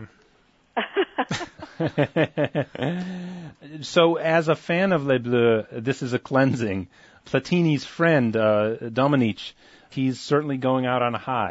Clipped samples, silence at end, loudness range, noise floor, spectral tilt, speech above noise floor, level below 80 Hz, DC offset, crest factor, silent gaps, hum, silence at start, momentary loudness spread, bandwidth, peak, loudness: under 0.1%; 0 s; 5 LU; -61 dBFS; -6.5 dB/octave; 38 dB; -62 dBFS; under 0.1%; 18 dB; none; none; 0 s; 13 LU; 8 kHz; -6 dBFS; -23 LUFS